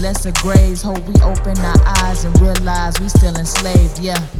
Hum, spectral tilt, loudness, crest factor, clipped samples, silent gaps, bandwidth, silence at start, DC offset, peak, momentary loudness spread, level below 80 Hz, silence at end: none; -5 dB/octave; -14 LUFS; 12 dB; under 0.1%; none; 16.5 kHz; 0 s; under 0.1%; 0 dBFS; 6 LU; -16 dBFS; 0 s